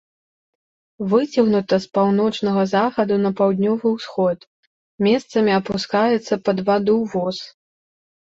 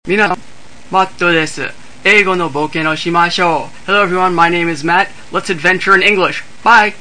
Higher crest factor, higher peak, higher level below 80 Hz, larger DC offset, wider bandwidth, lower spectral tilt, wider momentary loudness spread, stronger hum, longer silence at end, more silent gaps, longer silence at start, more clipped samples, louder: about the same, 16 dB vs 14 dB; second, -4 dBFS vs 0 dBFS; second, -60 dBFS vs -50 dBFS; second, under 0.1% vs 4%; second, 7.8 kHz vs 11 kHz; first, -6.5 dB/octave vs -4 dB/octave; second, 5 LU vs 9 LU; neither; first, 0.75 s vs 0.05 s; first, 4.47-4.98 s vs none; first, 1 s vs 0.05 s; second, under 0.1% vs 0.2%; second, -19 LUFS vs -12 LUFS